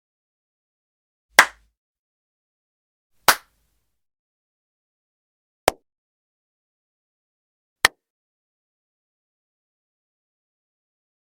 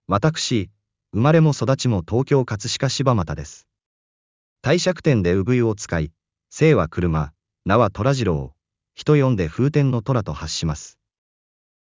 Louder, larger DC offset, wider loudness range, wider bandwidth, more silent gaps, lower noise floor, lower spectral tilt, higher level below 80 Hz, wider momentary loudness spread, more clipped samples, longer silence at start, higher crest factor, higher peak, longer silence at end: about the same, -20 LUFS vs -20 LUFS; neither; first, 10 LU vs 2 LU; first, 19 kHz vs 7.6 kHz; first, 1.77-3.10 s, 4.19-5.67 s, 5.98-7.76 s vs 3.86-4.56 s; second, -71 dBFS vs under -90 dBFS; second, 0 dB/octave vs -6 dB/octave; second, -60 dBFS vs -40 dBFS; second, 8 LU vs 13 LU; neither; first, 1.4 s vs 0.1 s; first, 30 dB vs 18 dB; about the same, 0 dBFS vs -2 dBFS; first, 3.45 s vs 1 s